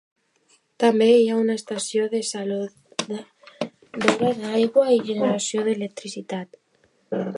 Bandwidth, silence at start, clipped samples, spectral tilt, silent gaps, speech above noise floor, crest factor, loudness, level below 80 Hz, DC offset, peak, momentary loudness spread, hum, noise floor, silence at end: 11.5 kHz; 0.8 s; under 0.1%; -4.5 dB/octave; none; 42 dB; 22 dB; -22 LUFS; -72 dBFS; under 0.1%; -2 dBFS; 16 LU; none; -64 dBFS; 0 s